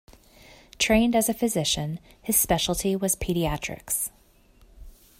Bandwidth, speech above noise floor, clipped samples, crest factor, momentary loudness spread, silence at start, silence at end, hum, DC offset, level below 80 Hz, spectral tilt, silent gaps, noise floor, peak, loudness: 16 kHz; 32 dB; under 0.1%; 20 dB; 10 LU; 0.8 s; 0.3 s; none; under 0.1%; -44 dBFS; -3.5 dB/octave; none; -57 dBFS; -8 dBFS; -24 LUFS